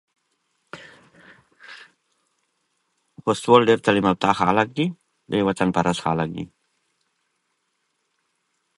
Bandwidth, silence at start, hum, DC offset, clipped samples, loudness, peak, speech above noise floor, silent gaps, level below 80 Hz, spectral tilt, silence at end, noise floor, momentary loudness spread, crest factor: 11.5 kHz; 0.75 s; none; under 0.1%; under 0.1%; -20 LUFS; 0 dBFS; 53 dB; none; -56 dBFS; -6 dB/octave; 2.3 s; -73 dBFS; 26 LU; 24 dB